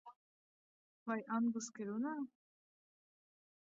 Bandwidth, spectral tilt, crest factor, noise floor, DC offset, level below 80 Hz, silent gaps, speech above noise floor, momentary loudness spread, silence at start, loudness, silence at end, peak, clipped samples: 7.2 kHz; -5.5 dB/octave; 18 dB; under -90 dBFS; under 0.1%; under -90 dBFS; 0.16-1.06 s; over 50 dB; 11 LU; 0.05 s; -41 LUFS; 1.35 s; -26 dBFS; under 0.1%